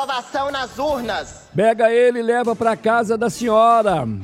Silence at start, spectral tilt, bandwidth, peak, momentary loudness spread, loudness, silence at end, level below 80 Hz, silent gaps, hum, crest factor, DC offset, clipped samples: 0 s; -5 dB/octave; 15 kHz; -4 dBFS; 9 LU; -18 LUFS; 0 s; -50 dBFS; none; none; 14 dB; under 0.1%; under 0.1%